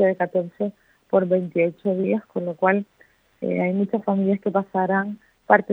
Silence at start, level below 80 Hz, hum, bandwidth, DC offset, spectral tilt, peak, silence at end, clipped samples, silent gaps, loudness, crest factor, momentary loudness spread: 0 s; -70 dBFS; none; 3.9 kHz; under 0.1%; -10 dB/octave; 0 dBFS; 0 s; under 0.1%; none; -23 LUFS; 22 dB; 9 LU